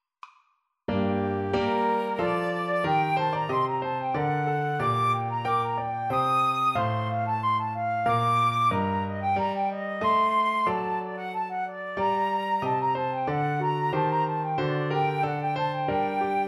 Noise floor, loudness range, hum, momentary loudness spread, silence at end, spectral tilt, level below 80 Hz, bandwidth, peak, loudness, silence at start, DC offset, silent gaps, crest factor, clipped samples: -69 dBFS; 2 LU; none; 6 LU; 0 s; -7 dB/octave; -60 dBFS; 13.5 kHz; -14 dBFS; -26 LUFS; 0.25 s; under 0.1%; none; 12 dB; under 0.1%